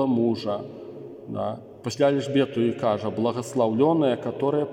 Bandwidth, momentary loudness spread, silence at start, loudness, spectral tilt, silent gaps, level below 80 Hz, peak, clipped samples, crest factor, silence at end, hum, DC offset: 15.5 kHz; 14 LU; 0 s; -24 LUFS; -6.5 dB/octave; none; -70 dBFS; -8 dBFS; under 0.1%; 16 dB; 0 s; none; under 0.1%